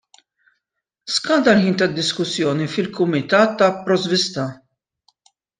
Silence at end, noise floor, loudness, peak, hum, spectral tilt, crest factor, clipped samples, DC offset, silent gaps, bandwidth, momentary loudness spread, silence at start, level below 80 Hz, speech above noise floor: 1.05 s; -79 dBFS; -18 LUFS; -2 dBFS; none; -4.5 dB/octave; 18 dB; under 0.1%; under 0.1%; none; 9.8 kHz; 8 LU; 1.05 s; -62 dBFS; 61 dB